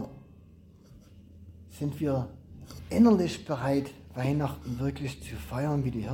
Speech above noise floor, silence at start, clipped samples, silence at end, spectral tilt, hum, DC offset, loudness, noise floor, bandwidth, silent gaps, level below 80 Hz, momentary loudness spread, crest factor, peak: 26 dB; 0 s; under 0.1%; 0 s; -7.5 dB/octave; none; under 0.1%; -29 LUFS; -54 dBFS; 17 kHz; none; -50 dBFS; 20 LU; 18 dB; -12 dBFS